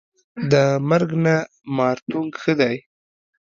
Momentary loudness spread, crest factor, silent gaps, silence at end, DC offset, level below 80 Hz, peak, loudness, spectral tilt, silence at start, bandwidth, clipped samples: 11 LU; 18 dB; 2.02-2.06 s; 0.8 s; under 0.1%; -62 dBFS; -2 dBFS; -20 LUFS; -7 dB/octave; 0.35 s; 7.6 kHz; under 0.1%